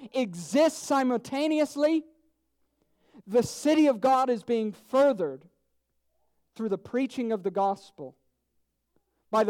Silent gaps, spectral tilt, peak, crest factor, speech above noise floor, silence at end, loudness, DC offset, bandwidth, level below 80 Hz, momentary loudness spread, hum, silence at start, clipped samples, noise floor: none; -5 dB/octave; -14 dBFS; 14 dB; 50 dB; 0 s; -27 LUFS; under 0.1%; 16 kHz; -72 dBFS; 11 LU; none; 0 s; under 0.1%; -76 dBFS